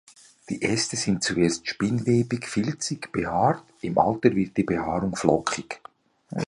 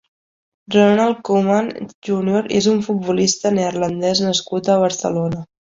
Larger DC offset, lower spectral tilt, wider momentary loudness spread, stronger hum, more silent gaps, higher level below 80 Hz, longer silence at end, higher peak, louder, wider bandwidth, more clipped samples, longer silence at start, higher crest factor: neither; about the same, -5 dB/octave vs -4.5 dB/octave; about the same, 8 LU vs 8 LU; neither; second, none vs 1.94-2.02 s; about the same, -52 dBFS vs -56 dBFS; second, 0.05 s vs 0.35 s; about the same, -2 dBFS vs -2 dBFS; second, -25 LUFS vs -17 LUFS; first, 11.5 kHz vs 8 kHz; neither; second, 0.5 s vs 0.7 s; first, 24 dB vs 16 dB